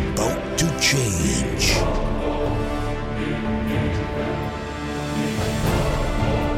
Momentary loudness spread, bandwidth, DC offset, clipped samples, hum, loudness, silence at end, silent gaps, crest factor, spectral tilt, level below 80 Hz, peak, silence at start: 8 LU; 16.5 kHz; under 0.1%; under 0.1%; none; -23 LUFS; 0 s; none; 16 dB; -4.5 dB/octave; -30 dBFS; -6 dBFS; 0 s